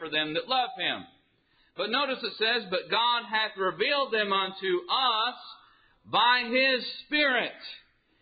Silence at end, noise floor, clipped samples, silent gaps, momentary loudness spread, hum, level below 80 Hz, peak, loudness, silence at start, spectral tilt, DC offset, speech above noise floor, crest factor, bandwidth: 0.45 s; -67 dBFS; under 0.1%; none; 12 LU; none; -74 dBFS; -12 dBFS; -26 LUFS; 0 s; -7 dB/octave; under 0.1%; 39 dB; 18 dB; 5 kHz